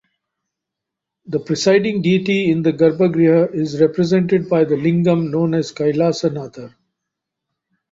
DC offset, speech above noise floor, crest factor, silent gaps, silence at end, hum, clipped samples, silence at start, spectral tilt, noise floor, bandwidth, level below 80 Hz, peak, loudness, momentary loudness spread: under 0.1%; 66 dB; 16 dB; none; 1.25 s; none; under 0.1%; 1.3 s; -7 dB/octave; -82 dBFS; 7.8 kHz; -58 dBFS; -2 dBFS; -16 LUFS; 7 LU